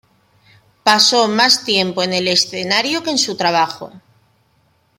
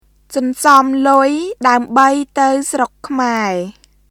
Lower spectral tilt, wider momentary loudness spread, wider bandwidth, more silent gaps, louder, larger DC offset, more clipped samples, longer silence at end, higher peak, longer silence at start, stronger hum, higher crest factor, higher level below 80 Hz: second, -2 dB/octave vs -3.5 dB/octave; second, 7 LU vs 10 LU; second, 16.5 kHz vs 19 kHz; neither; about the same, -14 LUFS vs -14 LUFS; neither; second, under 0.1% vs 0.2%; first, 1 s vs 0.4 s; about the same, 0 dBFS vs 0 dBFS; first, 0.85 s vs 0.3 s; neither; about the same, 18 dB vs 14 dB; second, -64 dBFS vs -54 dBFS